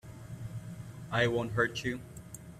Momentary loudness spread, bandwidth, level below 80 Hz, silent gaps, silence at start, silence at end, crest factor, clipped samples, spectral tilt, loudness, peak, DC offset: 17 LU; 15.5 kHz; -58 dBFS; none; 0.05 s; 0 s; 22 dB; under 0.1%; -5.5 dB/octave; -33 LUFS; -14 dBFS; under 0.1%